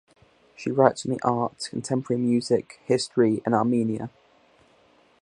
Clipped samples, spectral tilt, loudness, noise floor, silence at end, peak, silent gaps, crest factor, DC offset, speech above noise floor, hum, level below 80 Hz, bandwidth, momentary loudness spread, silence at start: under 0.1%; -6 dB/octave; -24 LUFS; -59 dBFS; 1.15 s; -2 dBFS; none; 24 dB; under 0.1%; 36 dB; none; -66 dBFS; 11 kHz; 9 LU; 0.6 s